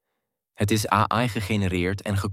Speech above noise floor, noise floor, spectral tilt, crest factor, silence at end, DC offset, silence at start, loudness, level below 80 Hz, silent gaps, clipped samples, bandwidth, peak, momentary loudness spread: 57 dB; -81 dBFS; -5.5 dB/octave; 20 dB; 0 s; under 0.1%; 0.6 s; -24 LUFS; -50 dBFS; none; under 0.1%; 16 kHz; -4 dBFS; 5 LU